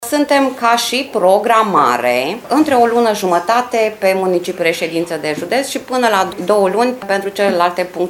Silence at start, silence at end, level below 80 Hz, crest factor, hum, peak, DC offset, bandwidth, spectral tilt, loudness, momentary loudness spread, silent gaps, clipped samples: 0 s; 0 s; -58 dBFS; 14 dB; none; 0 dBFS; under 0.1%; 17.5 kHz; -4 dB/octave; -14 LUFS; 6 LU; none; under 0.1%